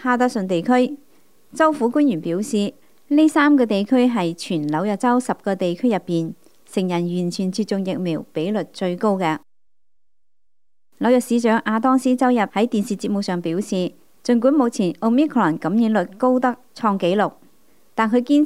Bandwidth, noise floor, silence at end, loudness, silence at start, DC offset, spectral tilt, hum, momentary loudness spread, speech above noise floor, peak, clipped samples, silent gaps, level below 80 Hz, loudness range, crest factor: 14 kHz; -84 dBFS; 0 s; -20 LUFS; 0 s; 0.3%; -6 dB/octave; none; 8 LU; 65 dB; -4 dBFS; under 0.1%; none; -70 dBFS; 5 LU; 16 dB